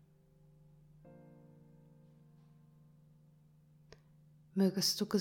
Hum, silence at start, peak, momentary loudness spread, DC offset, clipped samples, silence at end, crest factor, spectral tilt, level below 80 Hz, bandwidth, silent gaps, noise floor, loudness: none; 1.05 s; -18 dBFS; 29 LU; under 0.1%; under 0.1%; 0 s; 24 dB; -4.5 dB/octave; -76 dBFS; 18 kHz; none; -65 dBFS; -33 LUFS